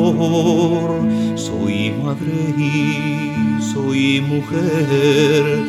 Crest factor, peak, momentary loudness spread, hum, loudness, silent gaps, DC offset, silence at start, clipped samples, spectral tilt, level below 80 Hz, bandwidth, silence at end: 14 dB; -2 dBFS; 6 LU; none; -17 LUFS; none; under 0.1%; 0 s; under 0.1%; -6 dB/octave; -54 dBFS; 13.5 kHz; 0 s